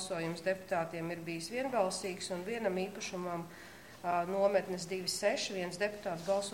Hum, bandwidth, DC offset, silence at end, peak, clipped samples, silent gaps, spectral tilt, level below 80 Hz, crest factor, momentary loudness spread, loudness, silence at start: none; 16.5 kHz; under 0.1%; 0 s; -18 dBFS; under 0.1%; none; -4 dB/octave; -70 dBFS; 18 dB; 9 LU; -36 LUFS; 0 s